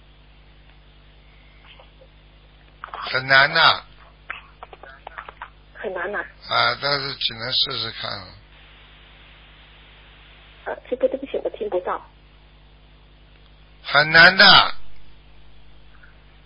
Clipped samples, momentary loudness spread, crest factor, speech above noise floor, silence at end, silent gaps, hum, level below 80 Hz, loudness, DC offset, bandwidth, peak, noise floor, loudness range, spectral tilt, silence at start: under 0.1%; 26 LU; 24 dB; 32 dB; 1.3 s; none; none; -50 dBFS; -17 LUFS; under 0.1%; 8 kHz; 0 dBFS; -49 dBFS; 14 LU; -5 dB/octave; 2.85 s